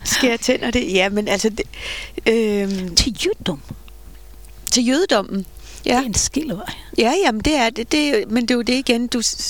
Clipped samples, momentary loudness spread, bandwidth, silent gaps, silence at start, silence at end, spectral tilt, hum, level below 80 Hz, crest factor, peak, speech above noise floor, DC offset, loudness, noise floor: under 0.1%; 11 LU; 19 kHz; none; 0 s; 0 s; -3 dB/octave; none; -38 dBFS; 20 dB; 0 dBFS; 21 dB; 0.7%; -19 LUFS; -40 dBFS